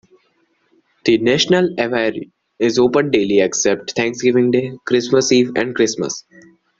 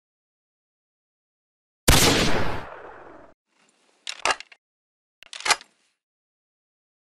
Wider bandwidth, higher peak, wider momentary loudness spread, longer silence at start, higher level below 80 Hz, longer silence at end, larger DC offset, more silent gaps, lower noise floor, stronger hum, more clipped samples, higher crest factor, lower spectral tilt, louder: second, 7.8 kHz vs 15 kHz; first, 0 dBFS vs -4 dBFS; second, 7 LU vs 24 LU; second, 1.05 s vs 1.85 s; second, -56 dBFS vs -38 dBFS; second, 0.6 s vs 1.5 s; neither; second, none vs 3.34-3.45 s, 4.58-5.22 s; about the same, -62 dBFS vs -64 dBFS; neither; neither; second, 16 dB vs 24 dB; about the same, -4 dB/octave vs -3 dB/octave; first, -16 LUFS vs -22 LUFS